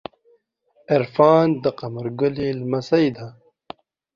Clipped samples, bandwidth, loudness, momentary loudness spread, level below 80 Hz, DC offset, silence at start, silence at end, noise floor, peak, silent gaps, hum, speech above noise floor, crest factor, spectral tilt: under 0.1%; 7.4 kHz; -20 LUFS; 17 LU; -58 dBFS; under 0.1%; 0.9 s; 0.85 s; -62 dBFS; -2 dBFS; none; none; 42 dB; 20 dB; -8 dB/octave